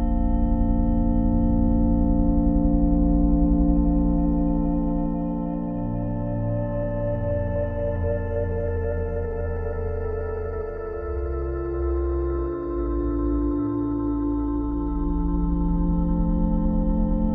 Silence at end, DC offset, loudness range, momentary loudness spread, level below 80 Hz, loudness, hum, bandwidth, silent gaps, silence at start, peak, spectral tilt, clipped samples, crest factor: 0 s; under 0.1%; 7 LU; 8 LU; -26 dBFS; -25 LUFS; none; 2.8 kHz; none; 0 s; -8 dBFS; -13.5 dB/octave; under 0.1%; 14 dB